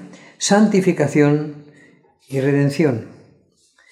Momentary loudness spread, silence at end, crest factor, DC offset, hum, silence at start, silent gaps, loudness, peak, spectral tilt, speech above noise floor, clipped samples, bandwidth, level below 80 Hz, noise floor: 12 LU; 0.85 s; 18 dB; under 0.1%; none; 0 s; none; -17 LUFS; -2 dBFS; -6 dB/octave; 41 dB; under 0.1%; 13 kHz; -68 dBFS; -57 dBFS